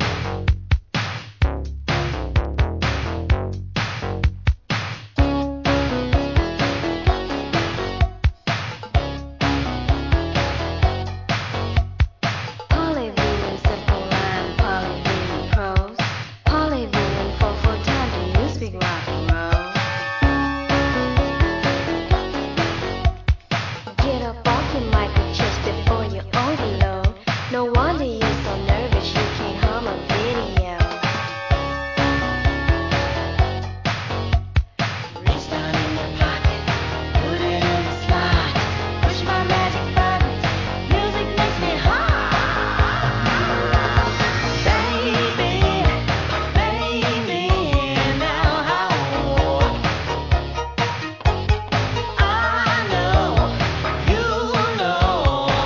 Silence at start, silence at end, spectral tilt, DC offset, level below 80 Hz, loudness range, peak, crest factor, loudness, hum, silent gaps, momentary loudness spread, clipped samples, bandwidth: 0 s; 0 s; -6 dB/octave; under 0.1%; -26 dBFS; 4 LU; -2 dBFS; 18 dB; -21 LUFS; none; none; 5 LU; under 0.1%; 7.4 kHz